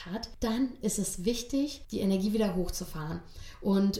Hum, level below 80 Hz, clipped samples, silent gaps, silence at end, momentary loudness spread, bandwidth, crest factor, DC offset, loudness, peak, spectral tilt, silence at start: none; -46 dBFS; under 0.1%; none; 0 s; 10 LU; 16 kHz; 14 dB; under 0.1%; -32 LUFS; -16 dBFS; -5 dB/octave; 0 s